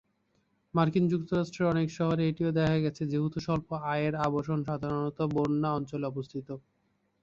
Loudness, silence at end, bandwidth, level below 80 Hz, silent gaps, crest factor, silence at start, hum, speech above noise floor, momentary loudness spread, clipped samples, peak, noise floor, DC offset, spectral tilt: -30 LUFS; 0.65 s; 7.4 kHz; -58 dBFS; none; 18 dB; 0.75 s; none; 44 dB; 8 LU; under 0.1%; -12 dBFS; -74 dBFS; under 0.1%; -8 dB/octave